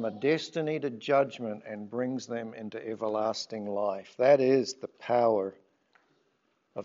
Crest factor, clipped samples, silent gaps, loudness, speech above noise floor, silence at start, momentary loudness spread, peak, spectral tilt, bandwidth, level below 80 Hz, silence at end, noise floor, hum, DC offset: 20 dB; under 0.1%; none; -30 LUFS; 44 dB; 0 s; 15 LU; -10 dBFS; -4.5 dB/octave; 7.8 kHz; -84 dBFS; 0 s; -73 dBFS; none; under 0.1%